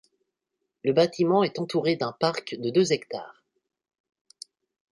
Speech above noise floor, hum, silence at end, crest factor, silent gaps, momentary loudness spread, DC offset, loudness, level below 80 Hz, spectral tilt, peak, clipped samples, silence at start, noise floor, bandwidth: 58 dB; none; 1.6 s; 20 dB; none; 23 LU; under 0.1%; -25 LUFS; -72 dBFS; -5.5 dB/octave; -8 dBFS; under 0.1%; 0.85 s; -82 dBFS; 11.5 kHz